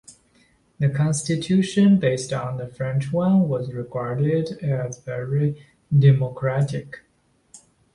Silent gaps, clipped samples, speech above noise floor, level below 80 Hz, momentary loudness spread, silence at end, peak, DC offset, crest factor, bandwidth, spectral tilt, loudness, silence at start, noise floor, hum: none; under 0.1%; 43 dB; -56 dBFS; 12 LU; 0.4 s; -6 dBFS; under 0.1%; 16 dB; 11.5 kHz; -7 dB/octave; -22 LUFS; 0.1 s; -64 dBFS; none